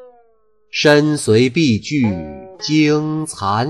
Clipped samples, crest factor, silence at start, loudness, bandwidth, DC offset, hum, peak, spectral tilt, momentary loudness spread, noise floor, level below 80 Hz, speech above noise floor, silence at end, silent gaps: under 0.1%; 14 dB; 0 s; -16 LUFS; 12.5 kHz; under 0.1%; none; -2 dBFS; -5.5 dB/octave; 13 LU; -59 dBFS; -50 dBFS; 44 dB; 0 s; none